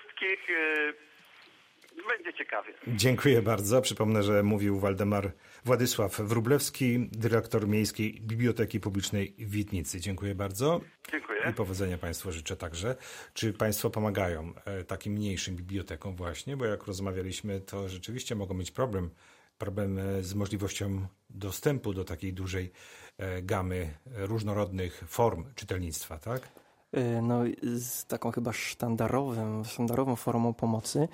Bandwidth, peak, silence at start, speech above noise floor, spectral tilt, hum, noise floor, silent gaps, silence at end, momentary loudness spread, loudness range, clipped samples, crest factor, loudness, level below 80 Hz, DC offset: 16 kHz; -12 dBFS; 0 s; 28 dB; -5.5 dB/octave; none; -59 dBFS; none; 0 s; 11 LU; 7 LU; under 0.1%; 20 dB; -32 LUFS; -56 dBFS; under 0.1%